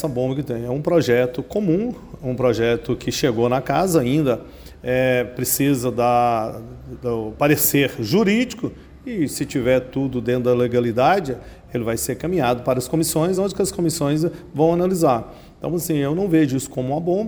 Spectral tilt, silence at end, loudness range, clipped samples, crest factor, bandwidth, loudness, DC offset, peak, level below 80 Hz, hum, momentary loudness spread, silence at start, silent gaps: -5.5 dB/octave; 0 s; 1 LU; under 0.1%; 16 dB; over 20 kHz; -20 LUFS; under 0.1%; -4 dBFS; -46 dBFS; none; 10 LU; 0 s; none